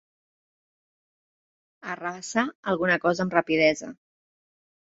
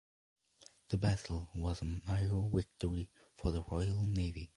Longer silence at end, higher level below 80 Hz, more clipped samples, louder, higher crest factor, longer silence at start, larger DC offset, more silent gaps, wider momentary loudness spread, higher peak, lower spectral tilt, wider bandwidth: first, 0.95 s vs 0.1 s; second, -66 dBFS vs -46 dBFS; neither; first, -25 LUFS vs -38 LUFS; first, 24 dB vs 18 dB; first, 1.85 s vs 0.6 s; neither; first, 2.55-2.63 s vs none; first, 14 LU vs 6 LU; first, -4 dBFS vs -20 dBFS; second, -4.5 dB/octave vs -7 dB/octave; second, 8 kHz vs 11.5 kHz